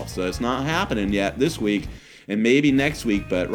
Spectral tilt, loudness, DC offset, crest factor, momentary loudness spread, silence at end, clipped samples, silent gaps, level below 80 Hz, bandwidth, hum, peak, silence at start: -5.5 dB/octave; -22 LUFS; under 0.1%; 18 dB; 10 LU; 0 s; under 0.1%; none; -40 dBFS; 17.5 kHz; none; -4 dBFS; 0 s